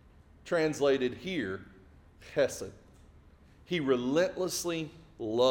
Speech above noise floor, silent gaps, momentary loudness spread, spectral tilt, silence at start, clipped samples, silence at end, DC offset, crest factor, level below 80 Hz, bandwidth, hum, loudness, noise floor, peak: 28 dB; none; 14 LU; -4.5 dB/octave; 0.45 s; under 0.1%; 0 s; under 0.1%; 20 dB; -60 dBFS; 18 kHz; none; -31 LUFS; -58 dBFS; -14 dBFS